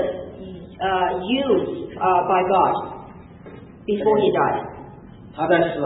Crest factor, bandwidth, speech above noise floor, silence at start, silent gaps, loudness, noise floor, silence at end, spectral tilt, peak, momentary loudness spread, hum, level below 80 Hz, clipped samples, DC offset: 18 dB; 4 kHz; 22 dB; 0 s; none; -20 LUFS; -41 dBFS; 0 s; -10.5 dB/octave; -4 dBFS; 23 LU; none; -50 dBFS; under 0.1%; under 0.1%